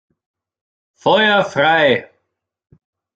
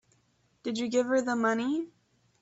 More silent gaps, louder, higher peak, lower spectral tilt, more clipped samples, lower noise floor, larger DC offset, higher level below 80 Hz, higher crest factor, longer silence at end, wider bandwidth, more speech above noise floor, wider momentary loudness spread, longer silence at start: neither; first, -14 LUFS vs -29 LUFS; first, -2 dBFS vs -14 dBFS; about the same, -5 dB/octave vs -4 dB/octave; neither; first, -74 dBFS vs -70 dBFS; neither; first, -62 dBFS vs -74 dBFS; about the same, 18 dB vs 16 dB; first, 1.1 s vs 0.55 s; about the same, 7.8 kHz vs 8 kHz; first, 60 dB vs 41 dB; second, 7 LU vs 11 LU; first, 1.05 s vs 0.65 s